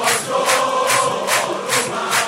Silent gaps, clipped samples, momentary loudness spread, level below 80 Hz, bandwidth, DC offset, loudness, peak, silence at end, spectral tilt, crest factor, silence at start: none; under 0.1%; 3 LU; -66 dBFS; 16 kHz; under 0.1%; -17 LUFS; -2 dBFS; 0 s; -1 dB/octave; 16 dB; 0 s